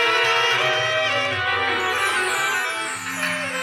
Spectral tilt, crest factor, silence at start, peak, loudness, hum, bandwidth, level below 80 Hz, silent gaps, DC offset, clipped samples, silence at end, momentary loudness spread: -1.5 dB/octave; 14 dB; 0 s; -8 dBFS; -20 LUFS; none; 17 kHz; -66 dBFS; none; under 0.1%; under 0.1%; 0 s; 7 LU